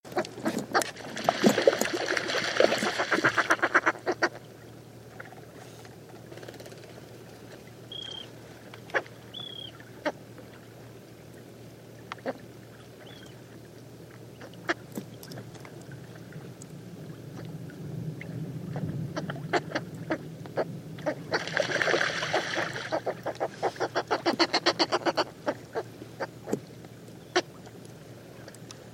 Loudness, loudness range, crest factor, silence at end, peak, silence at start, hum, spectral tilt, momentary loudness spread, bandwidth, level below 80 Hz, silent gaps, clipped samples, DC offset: -30 LUFS; 17 LU; 28 dB; 0 s; -4 dBFS; 0.05 s; none; -4 dB/octave; 23 LU; 16.5 kHz; -68 dBFS; none; under 0.1%; under 0.1%